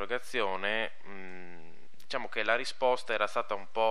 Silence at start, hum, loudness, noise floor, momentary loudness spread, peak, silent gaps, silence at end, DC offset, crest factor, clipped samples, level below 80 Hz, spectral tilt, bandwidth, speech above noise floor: 0 s; none; -32 LUFS; -59 dBFS; 17 LU; -12 dBFS; none; 0 s; 2%; 22 dB; under 0.1%; -80 dBFS; -3 dB/octave; 13.5 kHz; 27 dB